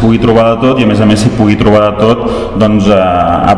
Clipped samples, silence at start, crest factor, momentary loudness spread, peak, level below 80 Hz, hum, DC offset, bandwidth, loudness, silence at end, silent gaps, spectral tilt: 4%; 0 s; 8 dB; 3 LU; 0 dBFS; -26 dBFS; none; 0.7%; 11 kHz; -8 LUFS; 0 s; none; -7 dB/octave